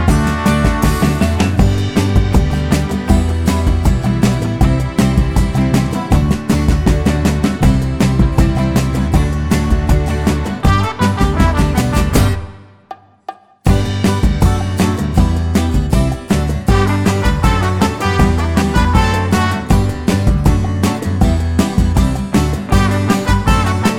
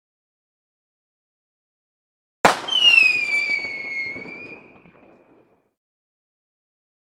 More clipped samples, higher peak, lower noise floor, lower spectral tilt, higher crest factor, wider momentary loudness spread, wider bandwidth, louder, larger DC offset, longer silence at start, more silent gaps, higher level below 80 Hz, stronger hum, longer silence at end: neither; about the same, 0 dBFS vs 0 dBFS; second, -36 dBFS vs -57 dBFS; first, -6.5 dB/octave vs -1 dB/octave; second, 12 dB vs 24 dB; second, 3 LU vs 23 LU; about the same, 16.5 kHz vs 15.5 kHz; about the same, -14 LUFS vs -16 LUFS; neither; second, 0 s vs 2.45 s; neither; first, -18 dBFS vs -66 dBFS; neither; second, 0 s vs 2.6 s